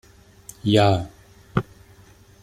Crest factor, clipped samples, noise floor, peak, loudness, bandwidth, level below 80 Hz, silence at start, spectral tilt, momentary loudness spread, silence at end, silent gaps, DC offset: 22 dB; under 0.1%; -50 dBFS; -4 dBFS; -22 LUFS; 14.5 kHz; -50 dBFS; 0.65 s; -6.5 dB/octave; 25 LU; 0.8 s; none; under 0.1%